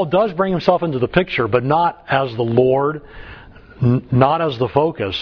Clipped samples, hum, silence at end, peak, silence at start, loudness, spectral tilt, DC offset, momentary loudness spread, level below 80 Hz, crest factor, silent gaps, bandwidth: under 0.1%; none; 0 s; 0 dBFS; 0 s; -17 LUFS; -8.5 dB/octave; under 0.1%; 5 LU; -44 dBFS; 18 dB; none; 5.4 kHz